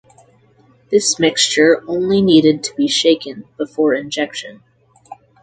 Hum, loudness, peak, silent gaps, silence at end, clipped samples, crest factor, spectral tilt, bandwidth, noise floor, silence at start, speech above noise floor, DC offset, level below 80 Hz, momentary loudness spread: none; -15 LUFS; 0 dBFS; none; 0.3 s; under 0.1%; 16 dB; -3.5 dB/octave; 9.6 kHz; -52 dBFS; 0.9 s; 37 dB; under 0.1%; -58 dBFS; 14 LU